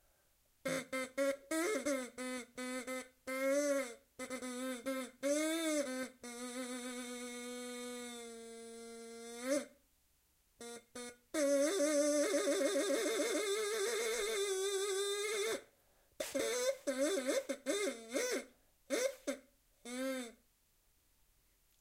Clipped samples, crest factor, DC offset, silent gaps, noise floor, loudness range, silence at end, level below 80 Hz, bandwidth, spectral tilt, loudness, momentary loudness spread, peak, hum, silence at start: under 0.1%; 16 dB; under 0.1%; none; -75 dBFS; 10 LU; 1.5 s; -76 dBFS; 16 kHz; -1.5 dB/octave; -38 LUFS; 15 LU; -24 dBFS; none; 0.65 s